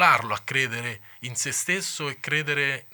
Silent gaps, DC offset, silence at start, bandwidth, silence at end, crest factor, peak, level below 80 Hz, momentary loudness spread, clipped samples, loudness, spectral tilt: none; under 0.1%; 0 s; 19 kHz; 0 s; 22 dB; -4 dBFS; -72 dBFS; 9 LU; under 0.1%; -25 LUFS; -2 dB/octave